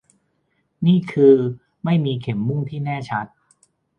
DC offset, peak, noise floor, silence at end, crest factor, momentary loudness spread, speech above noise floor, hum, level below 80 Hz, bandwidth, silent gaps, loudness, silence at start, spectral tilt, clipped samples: under 0.1%; -2 dBFS; -68 dBFS; 0.7 s; 18 dB; 13 LU; 50 dB; none; -60 dBFS; 8.6 kHz; none; -20 LUFS; 0.8 s; -9 dB/octave; under 0.1%